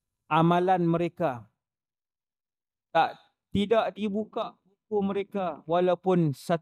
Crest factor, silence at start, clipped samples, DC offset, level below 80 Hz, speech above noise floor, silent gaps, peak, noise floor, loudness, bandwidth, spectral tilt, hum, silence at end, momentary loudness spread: 18 dB; 0.3 s; under 0.1%; under 0.1%; -64 dBFS; over 64 dB; none; -10 dBFS; under -90 dBFS; -27 LUFS; 13.5 kHz; -7.5 dB/octave; none; 0.05 s; 9 LU